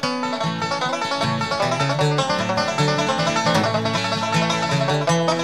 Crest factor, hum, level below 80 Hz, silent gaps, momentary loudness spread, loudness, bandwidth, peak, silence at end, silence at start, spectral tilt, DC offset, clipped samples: 16 dB; none; -54 dBFS; none; 4 LU; -20 LUFS; 14 kHz; -6 dBFS; 0 s; 0 s; -4.5 dB/octave; 0.3%; under 0.1%